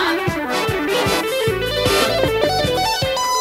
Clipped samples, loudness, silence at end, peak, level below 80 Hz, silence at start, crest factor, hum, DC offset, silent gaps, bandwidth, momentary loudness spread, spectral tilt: under 0.1%; -18 LUFS; 0 s; -2 dBFS; -38 dBFS; 0 s; 16 dB; none; under 0.1%; none; 16 kHz; 4 LU; -3.5 dB/octave